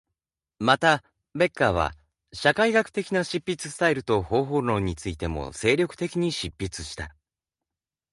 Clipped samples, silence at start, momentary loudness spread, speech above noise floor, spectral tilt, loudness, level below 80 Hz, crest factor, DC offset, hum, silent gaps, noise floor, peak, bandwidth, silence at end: under 0.1%; 0.6 s; 12 LU; 65 dB; -5 dB/octave; -25 LUFS; -46 dBFS; 22 dB; under 0.1%; none; none; -90 dBFS; -4 dBFS; 11.5 kHz; 1.05 s